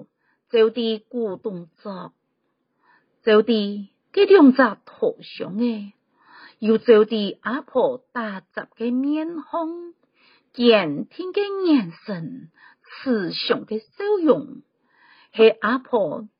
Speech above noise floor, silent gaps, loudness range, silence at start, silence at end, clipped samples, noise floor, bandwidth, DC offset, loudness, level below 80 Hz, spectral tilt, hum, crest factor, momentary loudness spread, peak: 52 dB; none; 6 LU; 0 s; 0.1 s; under 0.1%; -73 dBFS; 5.2 kHz; under 0.1%; -21 LUFS; -74 dBFS; -3.5 dB/octave; none; 20 dB; 18 LU; -2 dBFS